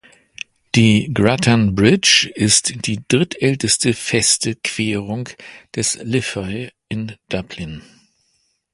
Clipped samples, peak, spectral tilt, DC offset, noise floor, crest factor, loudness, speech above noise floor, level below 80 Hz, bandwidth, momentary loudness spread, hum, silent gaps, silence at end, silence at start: under 0.1%; 0 dBFS; -3.5 dB/octave; under 0.1%; -65 dBFS; 18 dB; -16 LUFS; 48 dB; -46 dBFS; 11.5 kHz; 17 LU; none; none; 0.95 s; 0.75 s